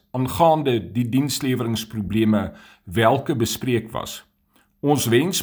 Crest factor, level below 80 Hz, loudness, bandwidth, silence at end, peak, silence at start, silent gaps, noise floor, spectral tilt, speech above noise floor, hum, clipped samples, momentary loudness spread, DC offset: 18 dB; -50 dBFS; -21 LUFS; over 20 kHz; 0 s; -2 dBFS; 0.15 s; none; -62 dBFS; -5 dB/octave; 41 dB; none; under 0.1%; 11 LU; under 0.1%